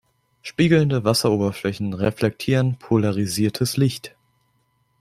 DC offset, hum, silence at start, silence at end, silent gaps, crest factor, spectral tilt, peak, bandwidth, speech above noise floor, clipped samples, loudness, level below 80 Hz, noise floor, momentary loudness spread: under 0.1%; none; 0.45 s; 0.9 s; none; 18 dB; -6 dB/octave; -2 dBFS; 15.5 kHz; 46 dB; under 0.1%; -21 LUFS; -54 dBFS; -66 dBFS; 9 LU